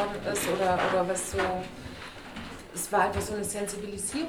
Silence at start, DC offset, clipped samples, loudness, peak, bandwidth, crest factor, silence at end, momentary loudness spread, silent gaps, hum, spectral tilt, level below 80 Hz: 0 s; under 0.1%; under 0.1%; -29 LUFS; -12 dBFS; over 20 kHz; 18 dB; 0 s; 15 LU; none; none; -3.5 dB/octave; -50 dBFS